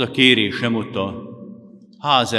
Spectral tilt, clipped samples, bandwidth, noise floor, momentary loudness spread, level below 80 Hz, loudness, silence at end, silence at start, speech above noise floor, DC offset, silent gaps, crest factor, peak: -4.5 dB/octave; under 0.1%; 12.5 kHz; -44 dBFS; 22 LU; -66 dBFS; -18 LUFS; 0 s; 0 s; 26 dB; under 0.1%; none; 20 dB; 0 dBFS